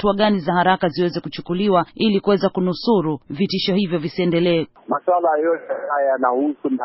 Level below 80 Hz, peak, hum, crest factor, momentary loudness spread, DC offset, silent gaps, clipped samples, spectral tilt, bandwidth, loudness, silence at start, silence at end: -52 dBFS; -4 dBFS; none; 16 dB; 6 LU; under 0.1%; none; under 0.1%; -4.5 dB/octave; 5.8 kHz; -19 LUFS; 0 s; 0 s